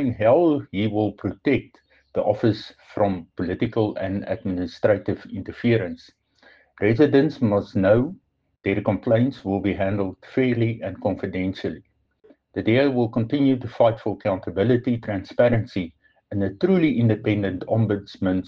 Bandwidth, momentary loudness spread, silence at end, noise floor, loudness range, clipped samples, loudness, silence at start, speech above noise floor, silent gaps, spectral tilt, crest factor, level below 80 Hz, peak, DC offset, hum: 6.6 kHz; 11 LU; 0 s; -57 dBFS; 4 LU; under 0.1%; -23 LUFS; 0 s; 35 dB; none; -9 dB/octave; 18 dB; -52 dBFS; -4 dBFS; under 0.1%; none